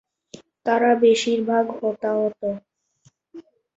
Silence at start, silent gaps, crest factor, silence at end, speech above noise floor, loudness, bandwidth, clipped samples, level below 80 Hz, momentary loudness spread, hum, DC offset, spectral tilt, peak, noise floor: 0.65 s; none; 16 dB; 0.4 s; 41 dB; -21 LUFS; 8 kHz; under 0.1%; -68 dBFS; 13 LU; none; under 0.1%; -4.5 dB/octave; -6 dBFS; -61 dBFS